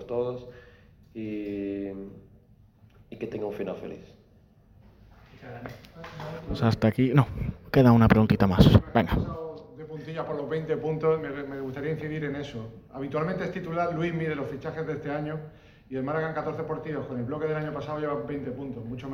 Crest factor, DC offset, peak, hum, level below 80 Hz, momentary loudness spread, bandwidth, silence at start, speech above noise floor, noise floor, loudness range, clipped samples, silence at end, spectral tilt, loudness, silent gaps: 24 dB; under 0.1%; -4 dBFS; none; -44 dBFS; 21 LU; 16.5 kHz; 0 s; 31 dB; -58 dBFS; 17 LU; under 0.1%; 0 s; -8.5 dB/octave; -27 LUFS; none